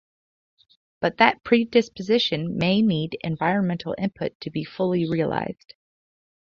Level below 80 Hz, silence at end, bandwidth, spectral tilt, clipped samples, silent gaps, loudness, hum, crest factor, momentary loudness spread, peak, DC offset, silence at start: -58 dBFS; 0.95 s; 7 kHz; -6.5 dB/octave; under 0.1%; 4.35-4.40 s; -23 LUFS; none; 24 dB; 10 LU; -2 dBFS; under 0.1%; 1 s